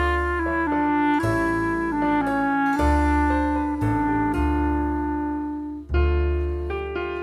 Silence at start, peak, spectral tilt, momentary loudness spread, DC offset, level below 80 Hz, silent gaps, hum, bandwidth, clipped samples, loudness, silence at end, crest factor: 0 s; -8 dBFS; -7.5 dB/octave; 7 LU; under 0.1%; -28 dBFS; none; none; 12 kHz; under 0.1%; -23 LUFS; 0 s; 14 dB